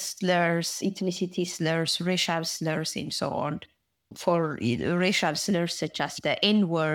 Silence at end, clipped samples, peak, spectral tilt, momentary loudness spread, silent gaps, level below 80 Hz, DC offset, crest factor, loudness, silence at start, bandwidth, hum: 0 s; under 0.1%; -8 dBFS; -4 dB/octave; 6 LU; none; -66 dBFS; under 0.1%; 18 dB; -27 LUFS; 0 s; 18 kHz; none